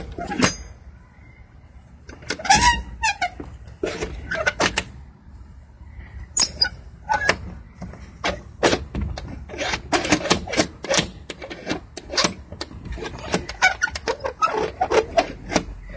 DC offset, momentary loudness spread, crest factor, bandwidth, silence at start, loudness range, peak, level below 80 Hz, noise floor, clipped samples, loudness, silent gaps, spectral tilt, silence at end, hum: under 0.1%; 18 LU; 24 dB; 8 kHz; 0 s; 3 LU; -2 dBFS; -38 dBFS; -46 dBFS; under 0.1%; -22 LUFS; none; -3 dB/octave; 0 s; none